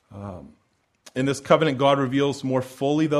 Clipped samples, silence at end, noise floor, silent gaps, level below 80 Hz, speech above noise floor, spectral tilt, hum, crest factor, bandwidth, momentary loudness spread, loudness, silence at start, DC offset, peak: under 0.1%; 0 s; -55 dBFS; none; -60 dBFS; 33 dB; -6 dB/octave; none; 20 dB; 13.5 kHz; 18 LU; -22 LUFS; 0.1 s; under 0.1%; -2 dBFS